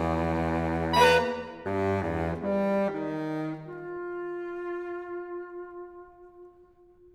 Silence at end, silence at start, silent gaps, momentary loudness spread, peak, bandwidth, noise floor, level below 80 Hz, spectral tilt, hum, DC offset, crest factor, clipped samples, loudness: 0.5 s; 0 s; none; 17 LU; -8 dBFS; 17.5 kHz; -57 dBFS; -48 dBFS; -6 dB/octave; none; under 0.1%; 22 dB; under 0.1%; -29 LUFS